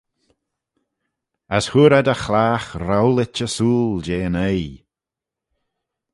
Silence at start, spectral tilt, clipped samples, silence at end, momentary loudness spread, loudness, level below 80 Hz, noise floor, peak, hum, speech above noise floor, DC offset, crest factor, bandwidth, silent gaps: 1.5 s; -6 dB/octave; under 0.1%; 1.35 s; 10 LU; -18 LUFS; -44 dBFS; -87 dBFS; -2 dBFS; none; 70 dB; under 0.1%; 18 dB; 11.5 kHz; none